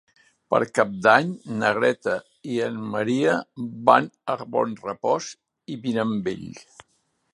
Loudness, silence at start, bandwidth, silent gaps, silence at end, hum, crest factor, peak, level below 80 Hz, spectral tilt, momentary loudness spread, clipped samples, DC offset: -23 LUFS; 0.5 s; 11.5 kHz; none; 0.7 s; none; 22 dB; -2 dBFS; -66 dBFS; -5.5 dB/octave; 13 LU; under 0.1%; under 0.1%